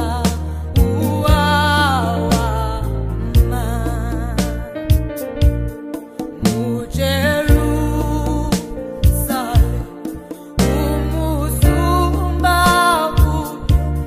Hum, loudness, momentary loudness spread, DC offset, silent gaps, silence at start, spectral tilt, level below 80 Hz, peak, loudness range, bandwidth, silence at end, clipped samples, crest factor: none; -17 LUFS; 11 LU; under 0.1%; none; 0 s; -5.5 dB/octave; -20 dBFS; 0 dBFS; 4 LU; 15.5 kHz; 0 s; under 0.1%; 16 dB